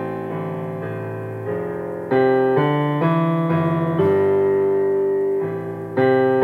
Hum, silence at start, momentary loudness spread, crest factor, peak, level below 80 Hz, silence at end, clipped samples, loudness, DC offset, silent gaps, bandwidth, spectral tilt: none; 0 s; 11 LU; 14 dB; -4 dBFS; -66 dBFS; 0 s; under 0.1%; -20 LUFS; under 0.1%; none; 4.2 kHz; -9.5 dB/octave